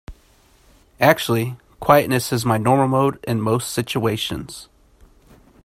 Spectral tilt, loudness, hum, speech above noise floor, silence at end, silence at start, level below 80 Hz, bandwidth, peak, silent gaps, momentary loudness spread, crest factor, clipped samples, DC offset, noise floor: -5.5 dB/octave; -19 LUFS; none; 36 dB; 1 s; 0.1 s; -50 dBFS; 16 kHz; 0 dBFS; none; 11 LU; 20 dB; under 0.1%; under 0.1%; -54 dBFS